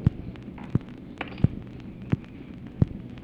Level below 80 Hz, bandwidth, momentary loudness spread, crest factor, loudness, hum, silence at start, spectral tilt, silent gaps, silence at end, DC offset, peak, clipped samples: -42 dBFS; 5.4 kHz; 14 LU; 24 dB; -31 LUFS; none; 0 s; -9.5 dB/octave; none; 0 s; under 0.1%; -6 dBFS; under 0.1%